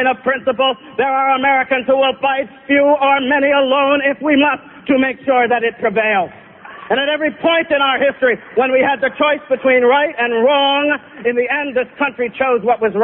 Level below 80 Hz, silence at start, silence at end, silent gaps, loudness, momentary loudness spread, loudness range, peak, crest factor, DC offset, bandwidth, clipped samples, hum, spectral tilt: -56 dBFS; 0 s; 0 s; none; -15 LUFS; 6 LU; 2 LU; -2 dBFS; 14 dB; under 0.1%; 3.8 kHz; under 0.1%; none; -9.5 dB/octave